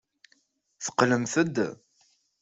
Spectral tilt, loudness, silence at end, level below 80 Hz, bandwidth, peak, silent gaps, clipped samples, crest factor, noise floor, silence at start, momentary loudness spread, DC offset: -4.5 dB/octave; -27 LUFS; 0.65 s; -68 dBFS; 8.2 kHz; -6 dBFS; none; under 0.1%; 24 dB; -69 dBFS; 0.8 s; 9 LU; under 0.1%